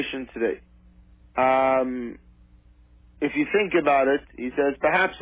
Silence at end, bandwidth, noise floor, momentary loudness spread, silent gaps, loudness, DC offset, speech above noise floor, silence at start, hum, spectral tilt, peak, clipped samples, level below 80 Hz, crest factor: 0 s; 4 kHz; -54 dBFS; 11 LU; none; -23 LUFS; under 0.1%; 31 dB; 0 s; 60 Hz at -55 dBFS; -8.5 dB/octave; -8 dBFS; under 0.1%; -54 dBFS; 16 dB